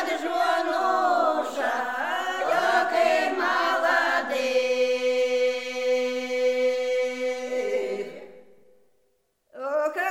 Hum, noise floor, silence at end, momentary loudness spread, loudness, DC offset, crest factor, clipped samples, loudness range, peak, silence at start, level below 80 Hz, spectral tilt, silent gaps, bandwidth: none; -70 dBFS; 0 s; 7 LU; -24 LUFS; 0.3%; 16 dB; under 0.1%; 6 LU; -10 dBFS; 0 s; -80 dBFS; -2 dB/octave; none; 15.5 kHz